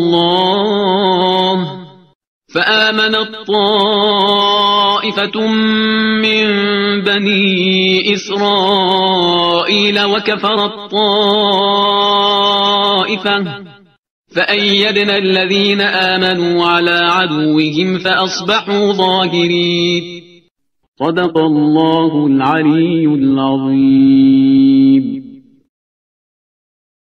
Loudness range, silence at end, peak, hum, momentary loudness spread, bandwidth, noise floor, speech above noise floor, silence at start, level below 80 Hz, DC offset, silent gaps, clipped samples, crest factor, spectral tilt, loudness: 3 LU; 1.8 s; 0 dBFS; none; 5 LU; 6.8 kHz; -58 dBFS; 46 dB; 0 s; -56 dBFS; under 0.1%; 2.15-2.21 s, 2.27-2.41 s, 13.98-14.03 s, 14.10-14.24 s, 20.51-20.55 s, 20.88-20.93 s; under 0.1%; 12 dB; -5.5 dB/octave; -12 LUFS